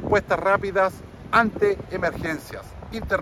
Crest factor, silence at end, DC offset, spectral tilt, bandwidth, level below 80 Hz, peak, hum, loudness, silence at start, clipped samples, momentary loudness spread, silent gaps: 20 dB; 0 s; under 0.1%; -6 dB/octave; 14 kHz; -44 dBFS; -4 dBFS; none; -23 LUFS; 0 s; under 0.1%; 15 LU; none